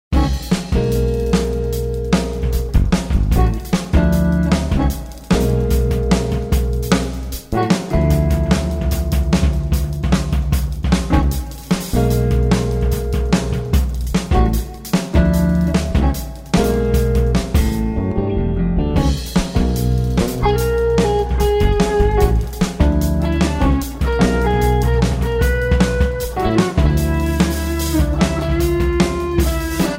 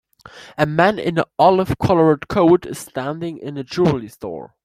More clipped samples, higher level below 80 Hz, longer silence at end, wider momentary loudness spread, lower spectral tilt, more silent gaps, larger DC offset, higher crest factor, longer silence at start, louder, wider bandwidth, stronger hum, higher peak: neither; first, -20 dBFS vs -46 dBFS; second, 0 s vs 0.2 s; second, 4 LU vs 15 LU; about the same, -6.5 dB/octave vs -7 dB/octave; neither; neither; about the same, 14 dB vs 16 dB; second, 0.1 s vs 0.35 s; about the same, -18 LUFS vs -18 LUFS; about the same, 16.5 kHz vs 15 kHz; neither; about the same, -2 dBFS vs -2 dBFS